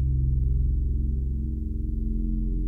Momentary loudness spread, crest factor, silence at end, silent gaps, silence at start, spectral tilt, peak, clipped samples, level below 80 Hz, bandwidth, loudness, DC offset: 5 LU; 10 dB; 0 s; none; 0 s; -13 dB/octave; -16 dBFS; under 0.1%; -26 dBFS; 0.5 kHz; -28 LUFS; under 0.1%